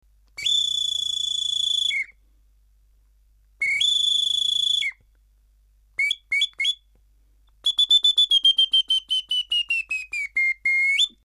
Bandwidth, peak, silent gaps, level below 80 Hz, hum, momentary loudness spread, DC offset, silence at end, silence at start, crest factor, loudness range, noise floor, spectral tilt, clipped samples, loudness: 15 kHz; -10 dBFS; none; -60 dBFS; none; 11 LU; under 0.1%; 0.15 s; 0.4 s; 14 dB; 6 LU; -59 dBFS; 4 dB/octave; under 0.1%; -20 LUFS